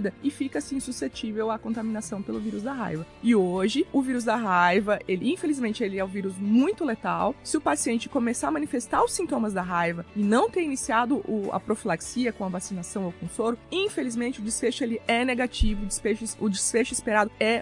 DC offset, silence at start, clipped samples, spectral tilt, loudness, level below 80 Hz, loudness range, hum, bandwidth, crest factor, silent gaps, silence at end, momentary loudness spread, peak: under 0.1%; 0 s; under 0.1%; -4.5 dB/octave; -26 LUFS; -42 dBFS; 4 LU; none; 11.5 kHz; 18 dB; none; 0 s; 8 LU; -8 dBFS